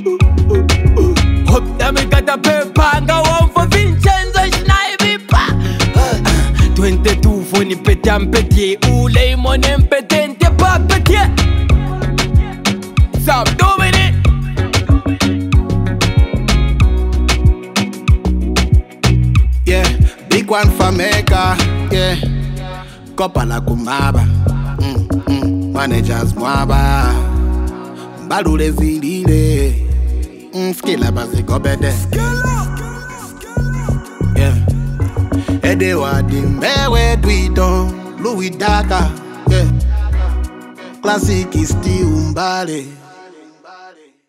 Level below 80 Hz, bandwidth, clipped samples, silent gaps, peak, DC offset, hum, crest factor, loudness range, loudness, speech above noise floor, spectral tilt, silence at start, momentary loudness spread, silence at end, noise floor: -16 dBFS; 16 kHz; under 0.1%; none; 0 dBFS; under 0.1%; none; 12 dB; 5 LU; -14 LUFS; 28 dB; -5.5 dB/octave; 0 s; 8 LU; 0.4 s; -41 dBFS